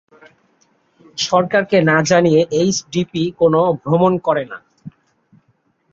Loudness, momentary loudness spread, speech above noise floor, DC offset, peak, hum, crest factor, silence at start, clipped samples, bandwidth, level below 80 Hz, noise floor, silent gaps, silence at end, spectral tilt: -16 LUFS; 9 LU; 47 dB; under 0.1%; -2 dBFS; none; 16 dB; 1.15 s; under 0.1%; 7.8 kHz; -56 dBFS; -62 dBFS; none; 1.05 s; -5 dB/octave